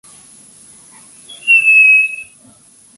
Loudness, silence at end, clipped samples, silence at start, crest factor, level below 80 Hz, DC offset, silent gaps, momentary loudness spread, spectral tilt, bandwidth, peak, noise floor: -7 LUFS; 0.75 s; under 0.1%; 1.3 s; 14 dB; -70 dBFS; under 0.1%; none; 16 LU; 1.5 dB/octave; 11.5 kHz; -2 dBFS; -46 dBFS